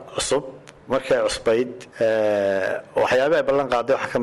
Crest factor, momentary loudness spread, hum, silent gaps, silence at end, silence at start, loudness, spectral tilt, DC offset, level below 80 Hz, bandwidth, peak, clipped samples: 10 dB; 7 LU; none; none; 0 s; 0 s; -21 LUFS; -4 dB/octave; under 0.1%; -52 dBFS; 12 kHz; -12 dBFS; under 0.1%